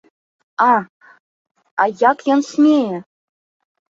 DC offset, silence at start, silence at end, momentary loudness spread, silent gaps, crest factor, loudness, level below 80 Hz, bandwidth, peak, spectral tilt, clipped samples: under 0.1%; 0.6 s; 0.95 s; 13 LU; 0.89-1.00 s, 1.20-1.45 s, 1.51-1.55 s, 1.71-1.77 s; 18 dB; -16 LUFS; -68 dBFS; 7.8 kHz; 0 dBFS; -5.5 dB/octave; under 0.1%